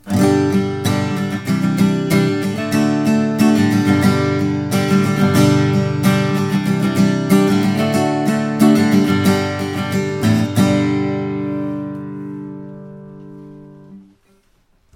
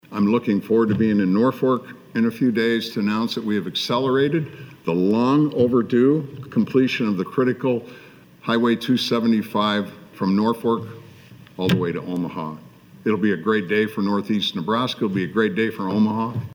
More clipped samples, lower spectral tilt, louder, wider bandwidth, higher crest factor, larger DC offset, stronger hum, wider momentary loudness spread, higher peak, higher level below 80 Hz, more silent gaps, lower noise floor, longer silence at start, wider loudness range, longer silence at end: neither; about the same, -6.5 dB/octave vs -6.5 dB/octave; first, -16 LUFS vs -21 LUFS; second, 16.5 kHz vs over 20 kHz; about the same, 16 dB vs 16 dB; neither; first, 50 Hz at -40 dBFS vs none; first, 14 LU vs 9 LU; first, 0 dBFS vs -6 dBFS; first, -54 dBFS vs -62 dBFS; neither; first, -57 dBFS vs -45 dBFS; about the same, 0.05 s vs 0.1 s; first, 8 LU vs 4 LU; first, 0.95 s vs 0 s